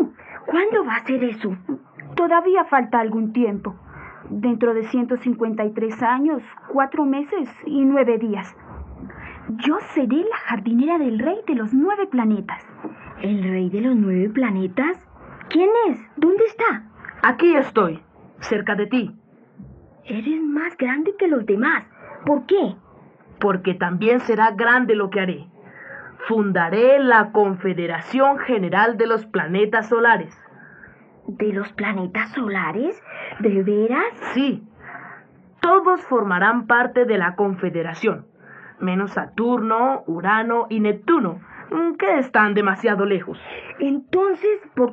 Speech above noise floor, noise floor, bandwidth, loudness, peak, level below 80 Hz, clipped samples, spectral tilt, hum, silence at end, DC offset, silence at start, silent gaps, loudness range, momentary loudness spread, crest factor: 29 dB; -48 dBFS; 7.2 kHz; -20 LUFS; -2 dBFS; -58 dBFS; under 0.1%; -8 dB/octave; none; 0 s; under 0.1%; 0 s; none; 4 LU; 16 LU; 18 dB